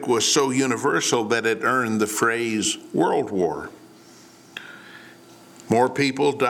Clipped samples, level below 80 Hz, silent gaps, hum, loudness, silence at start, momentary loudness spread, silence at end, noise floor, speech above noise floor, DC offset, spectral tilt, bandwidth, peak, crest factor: under 0.1%; -66 dBFS; none; none; -21 LUFS; 0 s; 19 LU; 0 s; -48 dBFS; 27 dB; under 0.1%; -3.5 dB/octave; 18.5 kHz; -6 dBFS; 18 dB